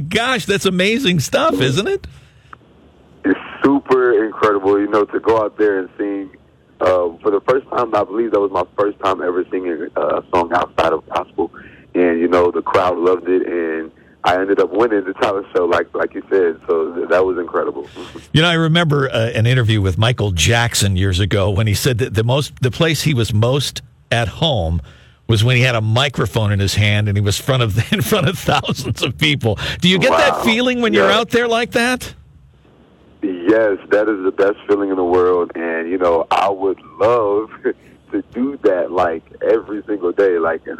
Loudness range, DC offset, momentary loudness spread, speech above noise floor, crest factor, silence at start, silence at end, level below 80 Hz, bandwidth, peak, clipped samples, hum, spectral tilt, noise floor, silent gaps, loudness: 3 LU; under 0.1%; 8 LU; 32 dB; 16 dB; 0 s; 0.05 s; -42 dBFS; 17.5 kHz; 0 dBFS; under 0.1%; none; -5.5 dB/octave; -48 dBFS; none; -16 LUFS